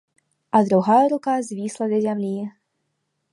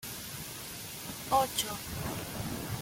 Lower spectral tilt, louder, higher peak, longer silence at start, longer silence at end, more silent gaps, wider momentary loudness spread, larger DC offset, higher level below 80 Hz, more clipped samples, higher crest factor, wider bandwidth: first, -7 dB/octave vs -3 dB/octave; first, -21 LUFS vs -35 LUFS; first, -4 dBFS vs -14 dBFS; first, 0.55 s vs 0 s; first, 0.85 s vs 0 s; neither; about the same, 12 LU vs 11 LU; neither; second, -70 dBFS vs -54 dBFS; neither; about the same, 18 dB vs 22 dB; second, 11.5 kHz vs 17 kHz